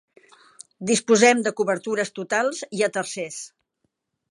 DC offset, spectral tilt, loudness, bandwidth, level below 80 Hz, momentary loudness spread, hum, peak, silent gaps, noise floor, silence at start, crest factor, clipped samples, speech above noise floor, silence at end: under 0.1%; -3 dB/octave; -22 LUFS; 11.5 kHz; -76 dBFS; 17 LU; none; -2 dBFS; none; -75 dBFS; 0.8 s; 22 dB; under 0.1%; 53 dB; 0.85 s